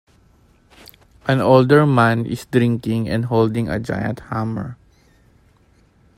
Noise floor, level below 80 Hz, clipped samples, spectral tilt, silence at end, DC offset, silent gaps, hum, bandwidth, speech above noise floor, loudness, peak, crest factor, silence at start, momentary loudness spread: -55 dBFS; -48 dBFS; under 0.1%; -7.5 dB/octave; 1.45 s; under 0.1%; none; none; 15.5 kHz; 38 dB; -18 LUFS; 0 dBFS; 20 dB; 1.25 s; 12 LU